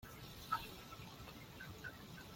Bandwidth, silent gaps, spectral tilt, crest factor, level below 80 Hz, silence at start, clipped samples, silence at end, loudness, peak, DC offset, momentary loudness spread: 16.5 kHz; none; -4 dB/octave; 26 dB; -66 dBFS; 0 s; under 0.1%; 0 s; -49 LUFS; -26 dBFS; under 0.1%; 10 LU